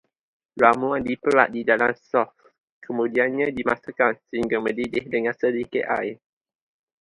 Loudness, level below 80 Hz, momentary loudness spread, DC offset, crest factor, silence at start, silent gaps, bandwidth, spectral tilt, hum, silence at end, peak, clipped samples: -23 LUFS; -60 dBFS; 8 LU; under 0.1%; 24 dB; 0.55 s; 2.60-2.81 s; 11 kHz; -6.5 dB/octave; none; 0.85 s; 0 dBFS; under 0.1%